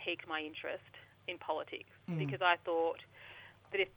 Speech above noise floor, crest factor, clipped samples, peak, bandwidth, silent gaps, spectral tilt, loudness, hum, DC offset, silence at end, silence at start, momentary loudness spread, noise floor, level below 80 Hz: 18 dB; 24 dB; under 0.1%; -14 dBFS; 19 kHz; none; -7 dB/octave; -38 LUFS; none; under 0.1%; 0.05 s; 0 s; 21 LU; -56 dBFS; -78 dBFS